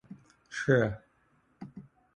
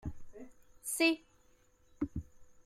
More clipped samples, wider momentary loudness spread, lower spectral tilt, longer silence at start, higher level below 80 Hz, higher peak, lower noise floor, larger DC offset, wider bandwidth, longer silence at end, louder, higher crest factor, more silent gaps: neither; about the same, 26 LU vs 24 LU; first, -6.5 dB/octave vs -3.5 dB/octave; about the same, 0.1 s vs 0.05 s; about the same, -60 dBFS vs -56 dBFS; first, -12 dBFS vs -16 dBFS; about the same, -69 dBFS vs -67 dBFS; neither; second, 10 kHz vs 16 kHz; first, 0.35 s vs 0.05 s; first, -29 LUFS vs -35 LUFS; about the same, 22 dB vs 24 dB; neither